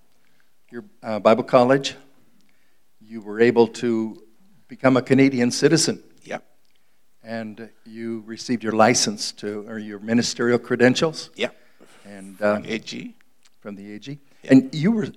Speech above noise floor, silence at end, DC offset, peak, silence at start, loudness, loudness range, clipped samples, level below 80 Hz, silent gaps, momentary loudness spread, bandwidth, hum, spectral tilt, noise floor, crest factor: 46 dB; 0.05 s; 0.3%; 0 dBFS; 0.75 s; -20 LUFS; 5 LU; under 0.1%; -70 dBFS; none; 22 LU; 14 kHz; none; -4.5 dB/octave; -67 dBFS; 22 dB